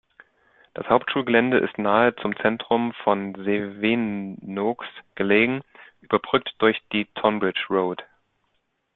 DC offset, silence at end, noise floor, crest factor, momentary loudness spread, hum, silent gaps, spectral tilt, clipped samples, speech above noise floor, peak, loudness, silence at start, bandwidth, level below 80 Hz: under 0.1%; 0.9 s; -73 dBFS; 20 dB; 11 LU; none; none; -9.5 dB/octave; under 0.1%; 50 dB; -2 dBFS; -23 LUFS; 0.8 s; 4.3 kHz; -62 dBFS